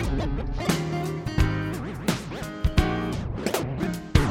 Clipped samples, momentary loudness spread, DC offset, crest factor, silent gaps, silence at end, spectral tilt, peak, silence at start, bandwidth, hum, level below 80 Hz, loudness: under 0.1%; 5 LU; under 0.1%; 24 dB; none; 0 s; -6 dB/octave; -2 dBFS; 0 s; 18 kHz; none; -32 dBFS; -27 LUFS